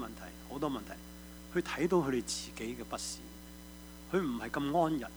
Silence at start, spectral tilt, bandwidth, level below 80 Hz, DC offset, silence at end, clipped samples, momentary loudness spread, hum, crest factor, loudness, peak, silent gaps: 0 s; -4.5 dB/octave; over 20 kHz; -56 dBFS; under 0.1%; 0 s; under 0.1%; 19 LU; none; 20 dB; -35 LUFS; -16 dBFS; none